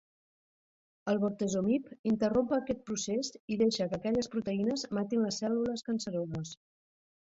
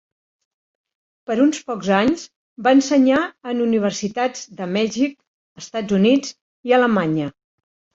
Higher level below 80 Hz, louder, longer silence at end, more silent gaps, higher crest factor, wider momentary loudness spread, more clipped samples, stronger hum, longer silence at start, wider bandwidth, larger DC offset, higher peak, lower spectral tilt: second, -66 dBFS vs -60 dBFS; second, -32 LUFS vs -19 LUFS; first, 0.85 s vs 0.65 s; second, 1.99-2.04 s, 3.40-3.48 s vs 2.36-2.56 s, 5.27-5.56 s, 6.41-6.63 s; about the same, 16 dB vs 18 dB; second, 7 LU vs 14 LU; neither; neither; second, 1.05 s vs 1.3 s; about the same, 8 kHz vs 7.8 kHz; neither; second, -16 dBFS vs -2 dBFS; about the same, -5 dB/octave vs -5 dB/octave